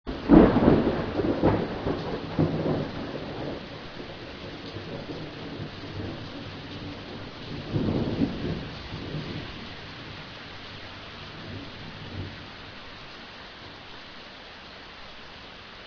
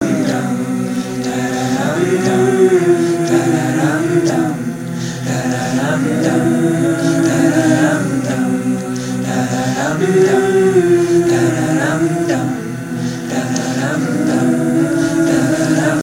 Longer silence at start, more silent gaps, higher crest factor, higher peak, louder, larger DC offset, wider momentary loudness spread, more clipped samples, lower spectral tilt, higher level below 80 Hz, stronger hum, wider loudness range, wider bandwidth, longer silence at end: about the same, 0.05 s vs 0 s; neither; first, 28 dB vs 14 dB; about the same, -2 dBFS vs 0 dBFS; second, -28 LUFS vs -15 LUFS; neither; first, 18 LU vs 8 LU; neither; first, -8 dB/octave vs -6 dB/octave; first, -44 dBFS vs -50 dBFS; neither; first, 13 LU vs 3 LU; second, 5.4 kHz vs 16 kHz; about the same, 0 s vs 0 s